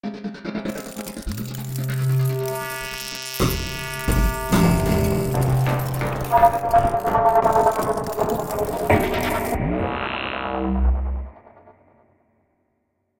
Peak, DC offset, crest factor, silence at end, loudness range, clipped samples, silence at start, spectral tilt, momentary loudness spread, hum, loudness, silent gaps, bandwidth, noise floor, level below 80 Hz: -2 dBFS; under 0.1%; 18 dB; 1.5 s; 7 LU; under 0.1%; 0.05 s; -6 dB/octave; 13 LU; none; -22 LUFS; none; 17 kHz; -71 dBFS; -30 dBFS